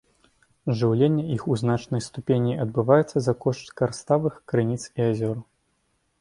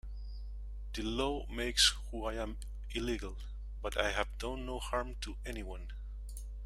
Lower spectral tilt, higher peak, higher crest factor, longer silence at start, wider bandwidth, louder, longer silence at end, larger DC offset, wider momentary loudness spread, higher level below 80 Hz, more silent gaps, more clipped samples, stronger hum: first, -7.5 dB/octave vs -3 dB/octave; first, -4 dBFS vs -10 dBFS; second, 20 dB vs 26 dB; first, 0.65 s vs 0.05 s; second, 11 kHz vs 14.5 kHz; first, -24 LUFS vs -36 LUFS; first, 0.8 s vs 0 s; neither; second, 9 LU vs 18 LU; second, -58 dBFS vs -42 dBFS; neither; neither; second, none vs 50 Hz at -40 dBFS